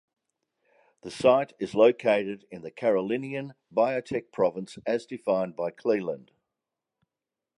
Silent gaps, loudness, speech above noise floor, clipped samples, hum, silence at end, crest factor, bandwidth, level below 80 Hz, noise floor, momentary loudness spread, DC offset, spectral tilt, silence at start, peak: none; -27 LUFS; 62 dB; under 0.1%; none; 1.4 s; 20 dB; 11 kHz; -70 dBFS; -89 dBFS; 14 LU; under 0.1%; -6 dB/octave; 1.05 s; -8 dBFS